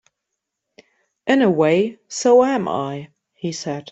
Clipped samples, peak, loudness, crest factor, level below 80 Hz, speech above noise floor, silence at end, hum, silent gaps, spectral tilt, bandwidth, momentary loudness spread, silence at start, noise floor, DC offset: under 0.1%; -4 dBFS; -19 LUFS; 16 dB; -64 dBFS; 62 dB; 0.1 s; none; none; -5 dB/octave; 8.2 kHz; 14 LU; 1.25 s; -80 dBFS; under 0.1%